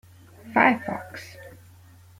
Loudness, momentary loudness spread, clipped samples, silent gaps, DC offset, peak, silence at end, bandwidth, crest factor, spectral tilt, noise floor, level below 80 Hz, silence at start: -23 LUFS; 23 LU; under 0.1%; none; under 0.1%; -4 dBFS; 0.7 s; 16.5 kHz; 22 dB; -6 dB/octave; -51 dBFS; -66 dBFS; 0.45 s